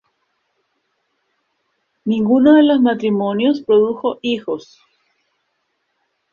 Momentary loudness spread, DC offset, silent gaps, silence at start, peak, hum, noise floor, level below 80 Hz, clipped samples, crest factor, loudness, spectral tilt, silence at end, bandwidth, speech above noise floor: 13 LU; under 0.1%; none; 2.05 s; -2 dBFS; none; -70 dBFS; -60 dBFS; under 0.1%; 16 dB; -16 LUFS; -7.5 dB/octave; 1.7 s; 6.8 kHz; 55 dB